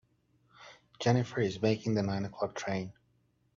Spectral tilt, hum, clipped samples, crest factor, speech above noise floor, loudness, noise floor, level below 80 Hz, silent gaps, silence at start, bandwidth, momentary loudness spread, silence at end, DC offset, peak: -6.5 dB/octave; none; under 0.1%; 22 dB; 41 dB; -32 LUFS; -72 dBFS; -66 dBFS; none; 0.6 s; 7.6 kHz; 7 LU; 0.65 s; under 0.1%; -12 dBFS